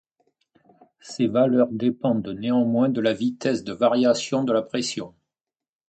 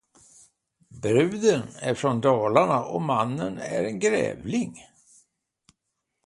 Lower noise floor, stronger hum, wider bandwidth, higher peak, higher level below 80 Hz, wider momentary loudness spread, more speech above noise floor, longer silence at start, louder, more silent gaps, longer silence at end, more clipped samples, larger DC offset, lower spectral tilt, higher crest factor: first, -89 dBFS vs -80 dBFS; neither; second, 9 kHz vs 11.5 kHz; about the same, -6 dBFS vs -6 dBFS; about the same, -64 dBFS vs -62 dBFS; about the same, 7 LU vs 9 LU; first, 67 dB vs 57 dB; first, 1.05 s vs 0.9 s; about the same, -22 LUFS vs -24 LUFS; neither; second, 0.8 s vs 1.45 s; neither; neither; about the same, -5.5 dB/octave vs -5.5 dB/octave; about the same, 18 dB vs 20 dB